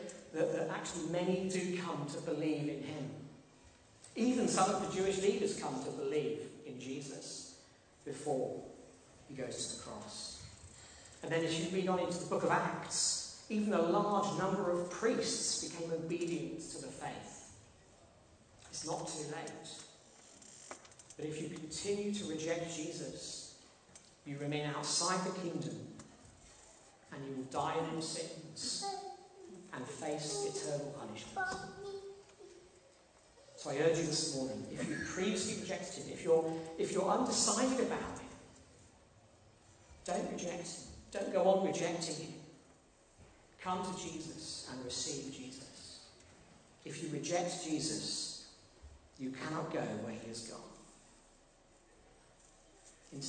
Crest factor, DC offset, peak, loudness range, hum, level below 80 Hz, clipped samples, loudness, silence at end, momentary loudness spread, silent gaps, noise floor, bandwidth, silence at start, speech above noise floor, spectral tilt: 22 dB; under 0.1%; -18 dBFS; 10 LU; none; -70 dBFS; under 0.1%; -38 LUFS; 0 s; 21 LU; none; -66 dBFS; 9.4 kHz; 0 s; 28 dB; -3.5 dB/octave